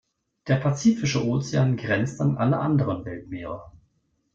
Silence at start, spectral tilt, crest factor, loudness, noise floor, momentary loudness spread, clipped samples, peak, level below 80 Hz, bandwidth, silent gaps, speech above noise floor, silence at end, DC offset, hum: 0.45 s; -6.5 dB/octave; 16 dB; -24 LUFS; -70 dBFS; 13 LU; under 0.1%; -8 dBFS; -56 dBFS; 7.6 kHz; none; 46 dB; 0.65 s; under 0.1%; none